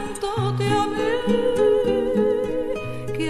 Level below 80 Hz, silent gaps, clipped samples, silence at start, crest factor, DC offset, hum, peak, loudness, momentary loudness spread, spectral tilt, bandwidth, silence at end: -48 dBFS; none; under 0.1%; 0 s; 14 dB; under 0.1%; none; -8 dBFS; -22 LUFS; 8 LU; -6 dB/octave; 13.5 kHz; 0 s